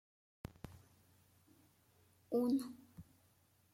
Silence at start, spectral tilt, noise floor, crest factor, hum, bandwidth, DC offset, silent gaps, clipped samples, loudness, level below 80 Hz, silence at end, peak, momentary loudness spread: 0.65 s; -7 dB/octave; -73 dBFS; 18 dB; none; 16.5 kHz; under 0.1%; none; under 0.1%; -39 LUFS; -72 dBFS; 0.7 s; -26 dBFS; 23 LU